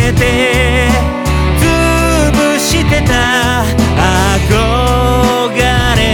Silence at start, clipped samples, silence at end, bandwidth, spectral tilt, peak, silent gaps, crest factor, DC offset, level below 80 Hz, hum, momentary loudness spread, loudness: 0 s; under 0.1%; 0 s; 19.5 kHz; -4.5 dB/octave; 0 dBFS; none; 10 dB; under 0.1%; -18 dBFS; none; 2 LU; -11 LUFS